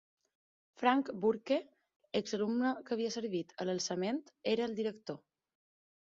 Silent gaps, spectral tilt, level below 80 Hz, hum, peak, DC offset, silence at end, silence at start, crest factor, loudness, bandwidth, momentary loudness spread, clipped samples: 1.96-2.00 s; -4 dB/octave; -78 dBFS; none; -16 dBFS; under 0.1%; 0.95 s; 0.8 s; 22 dB; -35 LUFS; 7.6 kHz; 8 LU; under 0.1%